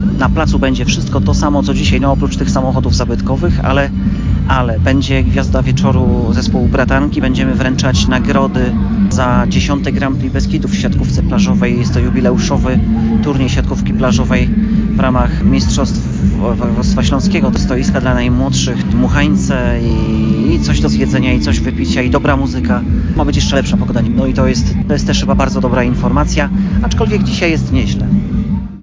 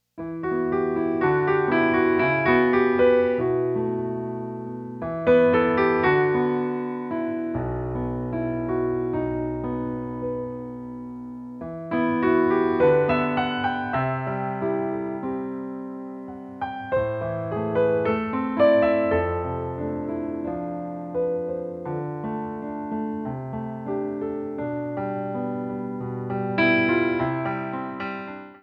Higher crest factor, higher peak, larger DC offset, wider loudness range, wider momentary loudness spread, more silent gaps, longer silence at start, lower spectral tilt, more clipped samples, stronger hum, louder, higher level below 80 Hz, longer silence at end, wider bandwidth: second, 10 dB vs 18 dB; first, 0 dBFS vs -6 dBFS; neither; second, 1 LU vs 8 LU; second, 3 LU vs 13 LU; neither; second, 0 s vs 0.15 s; second, -6.5 dB/octave vs -9.5 dB/octave; neither; neither; first, -13 LUFS vs -24 LUFS; first, -18 dBFS vs -50 dBFS; about the same, 0.05 s vs 0.05 s; first, 7.6 kHz vs 5.4 kHz